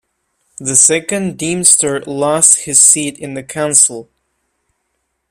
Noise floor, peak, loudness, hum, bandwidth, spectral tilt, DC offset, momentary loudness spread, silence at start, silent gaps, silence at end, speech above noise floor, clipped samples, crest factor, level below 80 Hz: -69 dBFS; 0 dBFS; -10 LUFS; none; over 20 kHz; -2 dB/octave; under 0.1%; 15 LU; 0.6 s; none; 1.3 s; 56 dB; 0.3%; 14 dB; -56 dBFS